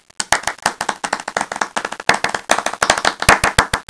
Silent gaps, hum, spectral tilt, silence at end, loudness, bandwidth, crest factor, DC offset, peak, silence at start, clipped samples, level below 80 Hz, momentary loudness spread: none; none; -2 dB/octave; 0.05 s; -17 LUFS; 11 kHz; 18 dB; under 0.1%; 0 dBFS; 0.2 s; 0.2%; -36 dBFS; 9 LU